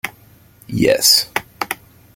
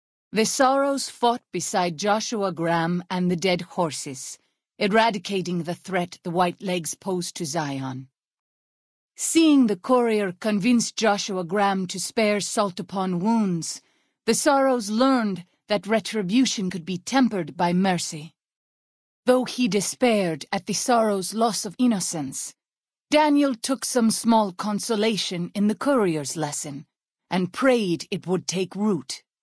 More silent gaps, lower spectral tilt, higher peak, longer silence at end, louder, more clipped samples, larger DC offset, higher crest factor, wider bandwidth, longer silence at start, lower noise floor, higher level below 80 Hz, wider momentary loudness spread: second, none vs 8.39-9.09 s, 18.56-19.23 s; second, -2.5 dB/octave vs -4.5 dB/octave; first, 0 dBFS vs -4 dBFS; first, 0.4 s vs 0.25 s; first, -15 LUFS vs -23 LUFS; neither; neither; about the same, 20 dB vs 18 dB; first, 17 kHz vs 11 kHz; second, 0.05 s vs 0.35 s; second, -48 dBFS vs under -90 dBFS; first, -50 dBFS vs -68 dBFS; first, 17 LU vs 9 LU